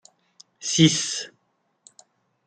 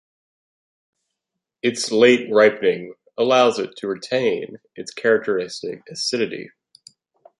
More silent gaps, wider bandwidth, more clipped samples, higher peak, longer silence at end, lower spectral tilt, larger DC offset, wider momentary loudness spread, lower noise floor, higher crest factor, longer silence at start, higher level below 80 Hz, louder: neither; second, 9.4 kHz vs 11.5 kHz; neither; about the same, -4 dBFS vs -2 dBFS; first, 1.2 s vs 0.95 s; about the same, -3.5 dB/octave vs -3.5 dB/octave; neither; about the same, 16 LU vs 16 LU; second, -71 dBFS vs -82 dBFS; about the same, 22 dB vs 20 dB; second, 0.6 s vs 1.65 s; first, -64 dBFS vs -70 dBFS; about the same, -21 LUFS vs -19 LUFS